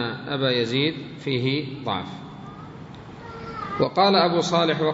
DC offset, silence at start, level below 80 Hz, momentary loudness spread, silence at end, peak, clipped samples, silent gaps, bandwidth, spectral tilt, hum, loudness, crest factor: under 0.1%; 0 s; -58 dBFS; 21 LU; 0 s; -6 dBFS; under 0.1%; none; 8 kHz; -5.5 dB/octave; none; -23 LUFS; 18 dB